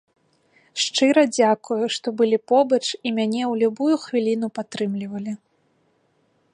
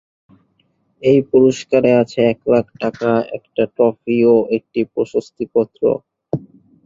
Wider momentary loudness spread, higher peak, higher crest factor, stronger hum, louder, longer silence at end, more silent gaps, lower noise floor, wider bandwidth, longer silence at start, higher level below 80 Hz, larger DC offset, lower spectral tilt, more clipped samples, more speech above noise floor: about the same, 12 LU vs 11 LU; about the same, -4 dBFS vs -2 dBFS; about the same, 18 dB vs 16 dB; neither; second, -21 LUFS vs -17 LUFS; first, 1.2 s vs 0.45 s; neither; about the same, -65 dBFS vs -63 dBFS; first, 11 kHz vs 7.6 kHz; second, 0.75 s vs 1 s; second, -74 dBFS vs -56 dBFS; neither; second, -4 dB/octave vs -7 dB/octave; neither; about the same, 44 dB vs 47 dB